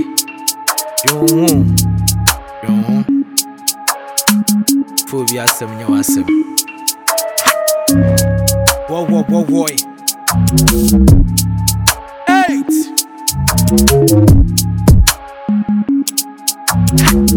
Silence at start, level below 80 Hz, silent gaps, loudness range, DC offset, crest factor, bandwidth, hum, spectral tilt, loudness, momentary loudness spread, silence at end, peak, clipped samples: 0 s; -22 dBFS; none; 3 LU; under 0.1%; 12 dB; 19.5 kHz; none; -4.5 dB/octave; -12 LUFS; 7 LU; 0 s; 0 dBFS; 0.1%